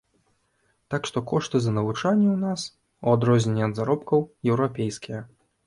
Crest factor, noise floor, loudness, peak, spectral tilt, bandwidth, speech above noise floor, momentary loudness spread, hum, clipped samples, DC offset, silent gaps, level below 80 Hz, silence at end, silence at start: 18 dB; -69 dBFS; -24 LUFS; -6 dBFS; -6.5 dB/octave; 11.5 kHz; 46 dB; 11 LU; none; under 0.1%; under 0.1%; none; -60 dBFS; 0.4 s; 0.9 s